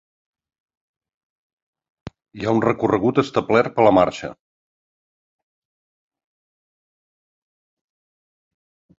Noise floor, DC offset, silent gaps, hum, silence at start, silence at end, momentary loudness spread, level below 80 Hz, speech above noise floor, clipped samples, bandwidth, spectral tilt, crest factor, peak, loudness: under -90 dBFS; under 0.1%; none; none; 2.35 s; 4.65 s; 12 LU; -56 dBFS; over 72 dB; under 0.1%; 7.8 kHz; -7 dB/octave; 22 dB; -2 dBFS; -18 LUFS